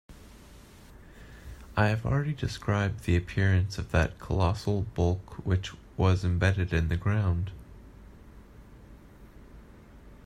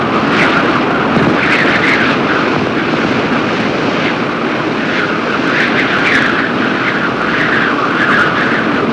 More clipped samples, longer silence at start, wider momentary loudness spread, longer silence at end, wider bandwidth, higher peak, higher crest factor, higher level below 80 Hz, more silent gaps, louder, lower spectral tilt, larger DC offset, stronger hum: neither; about the same, 0.1 s vs 0 s; first, 11 LU vs 4 LU; about the same, 0.1 s vs 0 s; about the same, 11 kHz vs 10.5 kHz; second, -10 dBFS vs -2 dBFS; first, 20 dB vs 10 dB; about the same, -44 dBFS vs -44 dBFS; neither; second, -29 LUFS vs -12 LUFS; first, -7 dB/octave vs -5.5 dB/octave; neither; neither